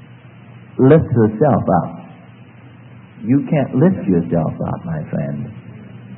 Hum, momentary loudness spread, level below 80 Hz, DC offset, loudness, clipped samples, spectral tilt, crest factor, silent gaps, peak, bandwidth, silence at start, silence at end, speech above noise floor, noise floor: none; 19 LU; -48 dBFS; under 0.1%; -16 LUFS; under 0.1%; -14 dB/octave; 18 dB; none; 0 dBFS; 3.9 kHz; 0.25 s; 0 s; 25 dB; -41 dBFS